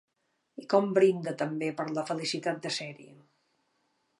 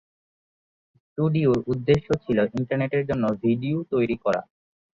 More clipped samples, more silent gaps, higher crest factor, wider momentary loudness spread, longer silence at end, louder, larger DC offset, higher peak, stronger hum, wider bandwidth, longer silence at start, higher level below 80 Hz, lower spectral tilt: neither; neither; about the same, 20 dB vs 18 dB; first, 14 LU vs 4 LU; first, 1.05 s vs 0.5 s; second, -29 LUFS vs -24 LUFS; neither; about the same, -10 dBFS vs -8 dBFS; neither; first, 11.5 kHz vs 7.6 kHz; second, 0.6 s vs 1.15 s; second, -84 dBFS vs -52 dBFS; second, -5 dB/octave vs -8.5 dB/octave